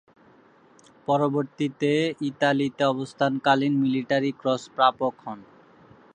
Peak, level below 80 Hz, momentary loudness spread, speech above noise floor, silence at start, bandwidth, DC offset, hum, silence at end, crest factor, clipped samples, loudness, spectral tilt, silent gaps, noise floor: -6 dBFS; -72 dBFS; 8 LU; 32 dB; 1.1 s; 9.4 kHz; under 0.1%; none; 0.7 s; 20 dB; under 0.1%; -24 LUFS; -6 dB/octave; none; -56 dBFS